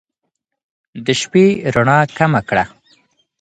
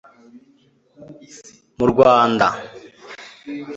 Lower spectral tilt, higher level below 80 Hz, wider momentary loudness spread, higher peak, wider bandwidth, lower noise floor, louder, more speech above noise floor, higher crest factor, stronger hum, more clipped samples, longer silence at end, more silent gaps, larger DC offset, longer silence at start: about the same, -5.5 dB/octave vs -5.5 dB/octave; about the same, -48 dBFS vs -52 dBFS; second, 7 LU vs 26 LU; about the same, 0 dBFS vs -2 dBFS; first, 9.6 kHz vs 8 kHz; first, -75 dBFS vs -57 dBFS; about the same, -15 LUFS vs -15 LUFS; first, 61 dB vs 40 dB; about the same, 16 dB vs 20 dB; neither; neither; first, 0.75 s vs 0 s; neither; neither; about the same, 0.95 s vs 1 s